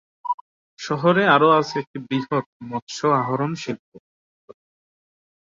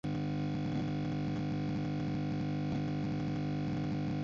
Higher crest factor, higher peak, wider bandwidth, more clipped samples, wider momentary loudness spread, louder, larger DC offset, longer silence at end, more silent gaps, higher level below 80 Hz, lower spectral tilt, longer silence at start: first, 20 dB vs 10 dB; first, -4 dBFS vs -26 dBFS; about the same, 7.8 kHz vs 7.4 kHz; neither; first, 16 LU vs 0 LU; first, -21 LUFS vs -36 LUFS; neither; first, 1.6 s vs 0 s; first, 0.34-0.77 s, 1.87-1.94 s, 2.46-2.60 s, 2.82-2.87 s, 3.79-3.92 s vs none; second, -66 dBFS vs -54 dBFS; second, -5.5 dB/octave vs -7.5 dB/octave; first, 0.25 s vs 0.05 s